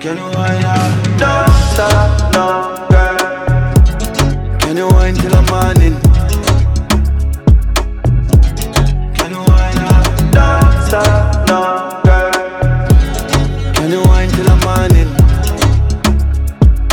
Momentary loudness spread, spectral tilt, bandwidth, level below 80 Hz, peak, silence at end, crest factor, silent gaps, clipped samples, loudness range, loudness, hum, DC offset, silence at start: 5 LU; -6 dB/octave; 19 kHz; -12 dBFS; 0 dBFS; 0 s; 10 dB; none; under 0.1%; 1 LU; -12 LUFS; none; under 0.1%; 0 s